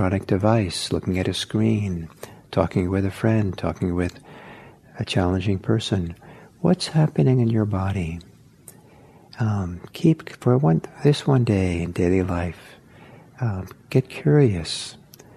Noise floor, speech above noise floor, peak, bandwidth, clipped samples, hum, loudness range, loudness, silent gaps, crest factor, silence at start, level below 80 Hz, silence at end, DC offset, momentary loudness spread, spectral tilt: -49 dBFS; 28 dB; -4 dBFS; 13.5 kHz; under 0.1%; none; 4 LU; -22 LUFS; none; 20 dB; 0 s; -52 dBFS; 0.4 s; under 0.1%; 13 LU; -7 dB/octave